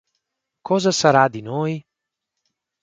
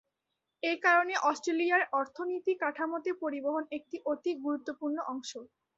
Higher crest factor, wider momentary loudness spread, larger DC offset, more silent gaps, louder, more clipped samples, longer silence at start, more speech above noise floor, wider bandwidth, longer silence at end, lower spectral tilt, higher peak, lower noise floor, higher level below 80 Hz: about the same, 22 dB vs 20 dB; about the same, 11 LU vs 12 LU; neither; neither; first, -19 LUFS vs -32 LUFS; neither; about the same, 0.65 s vs 0.65 s; first, 65 dB vs 54 dB; first, 9.4 kHz vs 8 kHz; first, 1 s vs 0.3 s; first, -4.5 dB/octave vs -2 dB/octave; first, 0 dBFS vs -12 dBFS; about the same, -83 dBFS vs -85 dBFS; first, -64 dBFS vs -82 dBFS